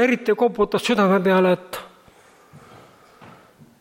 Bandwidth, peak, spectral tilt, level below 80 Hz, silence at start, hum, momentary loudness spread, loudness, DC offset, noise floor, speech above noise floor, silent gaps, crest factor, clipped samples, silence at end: 16.5 kHz; -6 dBFS; -6 dB/octave; -56 dBFS; 0 s; none; 11 LU; -19 LUFS; under 0.1%; -52 dBFS; 33 dB; none; 16 dB; under 0.1%; 1.25 s